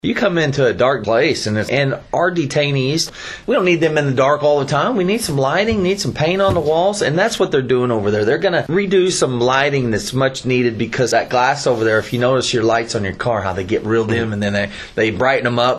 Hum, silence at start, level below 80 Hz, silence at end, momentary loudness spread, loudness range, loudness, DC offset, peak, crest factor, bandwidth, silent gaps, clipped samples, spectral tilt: none; 0.05 s; -46 dBFS; 0 s; 4 LU; 1 LU; -16 LUFS; under 0.1%; 0 dBFS; 16 dB; 13 kHz; none; under 0.1%; -5 dB/octave